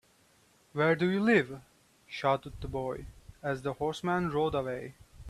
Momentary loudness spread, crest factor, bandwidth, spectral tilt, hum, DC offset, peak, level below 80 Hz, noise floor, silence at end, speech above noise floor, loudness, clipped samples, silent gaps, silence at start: 16 LU; 20 dB; 13.5 kHz; -6.5 dB/octave; none; under 0.1%; -12 dBFS; -54 dBFS; -65 dBFS; 0 s; 35 dB; -31 LUFS; under 0.1%; none; 0.75 s